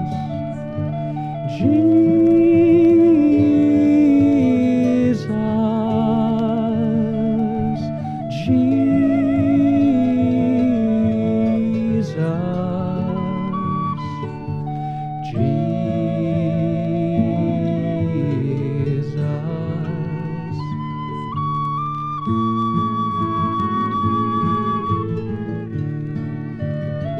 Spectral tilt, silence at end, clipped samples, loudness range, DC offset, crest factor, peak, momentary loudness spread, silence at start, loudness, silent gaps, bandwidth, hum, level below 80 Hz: -9.5 dB/octave; 0 s; under 0.1%; 9 LU; under 0.1%; 14 dB; -4 dBFS; 12 LU; 0 s; -19 LUFS; none; 6.8 kHz; none; -48 dBFS